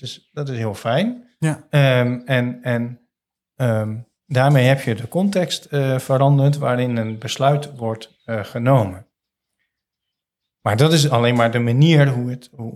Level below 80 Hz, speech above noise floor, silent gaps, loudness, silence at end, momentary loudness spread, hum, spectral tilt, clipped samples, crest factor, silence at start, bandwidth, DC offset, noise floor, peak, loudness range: -64 dBFS; 65 dB; none; -19 LUFS; 0 s; 13 LU; none; -6.5 dB/octave; under 0.1%; 18 dB; 0.05 s; 14 kHz; under 0.1%; -83 dBFS; -2 dBFS; 4 LU